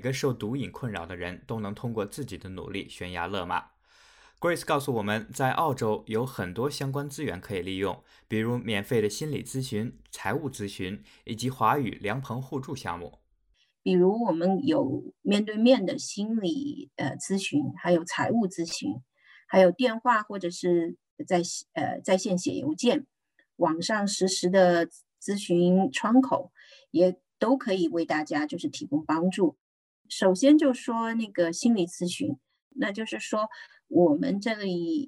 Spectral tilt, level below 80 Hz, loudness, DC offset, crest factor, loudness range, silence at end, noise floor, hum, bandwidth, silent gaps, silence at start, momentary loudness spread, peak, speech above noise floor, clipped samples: -5.5 dB/octave; -64 dBFS; -27 LUFS; under 0.1%; 20 dB; 6 LU; 0 s; -70 dBFS; none; 16.5 kHz; 21.11-21.17 s, 29.61-30.05 s, 32.62-32.71 s; 0 s; 13 LU; -8 dBFS; 43 dB; under 0.1%